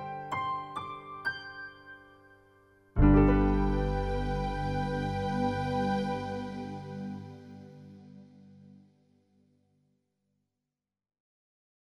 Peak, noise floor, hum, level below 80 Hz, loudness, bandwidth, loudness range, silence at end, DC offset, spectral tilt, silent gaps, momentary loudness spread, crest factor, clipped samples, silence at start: -12 dBFS; -89 dBFS; 50 Hz at -50 dBFS; -38 dBFS; -31 LUFS; 11 kHz; 16 LU; 3.15 s; under 0.1%; -8 dB/octave; none; 25 LU; 22 dB; under 0.1%; 0 s